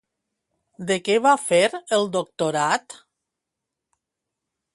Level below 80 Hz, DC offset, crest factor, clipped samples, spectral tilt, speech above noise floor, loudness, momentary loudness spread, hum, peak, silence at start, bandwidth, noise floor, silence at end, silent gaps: -70 dBFS; under 0.1%; 20 dB; under 0.1%; -3.5 dB/octave; 63 dB; -21 LUFS; 8 LU; none; -6 dBFS; 0.8 s; 11.5 kHz; -84 dBFS; 1.8 s; none